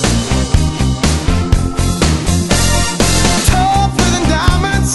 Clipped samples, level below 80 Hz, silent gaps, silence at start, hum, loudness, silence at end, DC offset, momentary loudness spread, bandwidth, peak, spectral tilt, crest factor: 0.2%; -18 dBFS; none; 0 s; none; -13 LUFS; 0 s; under 0.1%; 3 LU; 12 kHz; 0 dBFS; -4 dB/octave; 12 dB